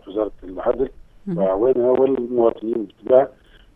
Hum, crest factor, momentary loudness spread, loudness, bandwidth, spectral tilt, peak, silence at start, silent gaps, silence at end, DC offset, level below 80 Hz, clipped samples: none; 20 dB; 10 LU; -20 LUFS; 3.8 kHz; -10 dB/octave; 0 dBFS; 0.05 s; none; 0.45 s; under 0.1%; -46 dBFS; under 0.1%